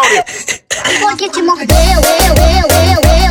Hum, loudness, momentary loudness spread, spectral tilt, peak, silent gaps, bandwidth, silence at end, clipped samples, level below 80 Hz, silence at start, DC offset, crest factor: none; -10 LUFS; 7 LU; -4 dB/octave; 0 dBFS; none; over 20 kHz; 0 s; under 0.1%; -14 dBFS; 0 s; under 0.1%; 8 dB